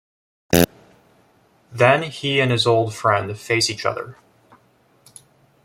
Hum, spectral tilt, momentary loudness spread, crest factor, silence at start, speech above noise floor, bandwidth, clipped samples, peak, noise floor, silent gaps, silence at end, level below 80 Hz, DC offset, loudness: none; -4.5 dB/octave; 9 LU; 22 dB; 0.5 s; 39 dB; 16.5 kHz; under 0.1%; 0 dBFS; -58 dBFS; none; 1.55 s; -54 dBFS; under 0.1%; -19 LUFS